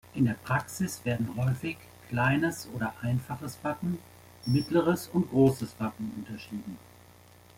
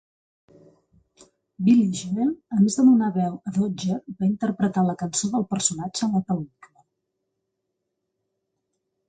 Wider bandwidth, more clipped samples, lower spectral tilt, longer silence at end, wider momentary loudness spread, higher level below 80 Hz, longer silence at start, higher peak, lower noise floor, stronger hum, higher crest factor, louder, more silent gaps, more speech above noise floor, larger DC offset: first, 16.5 kHz vs 9.6 kHz; neither; about the same, -6.5 dB/octave vs -5.5 dB/octave; second, 0.8 s vs 2.65 s; first, 14 LU vs 9 LU; about the same, -60 dBFS vs -64 dBFS; second, 0.05 s vs 1.6 s; about the same, -10 dBFS vs -8 dBFS; second, -55 dBFS vs -79 dBFS; neither; about the same, 20 dB vs 18 dB; second, -30 LUFS vs -23 LUFS; neither; second, 26 dB vs 57 dB; neither